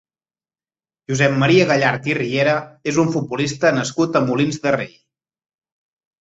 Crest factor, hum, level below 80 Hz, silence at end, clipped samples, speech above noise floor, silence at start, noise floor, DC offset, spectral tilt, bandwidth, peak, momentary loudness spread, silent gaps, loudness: 18 dB; none; -56 dBFS; 1.3 s; under 0.1%; over 72 dB; 1.1 s; under -90 dBFS; under 0.1%; -5.5 dB/octave; 8 kHz; -2 dBFS; 8 LU; none; -18 LUFS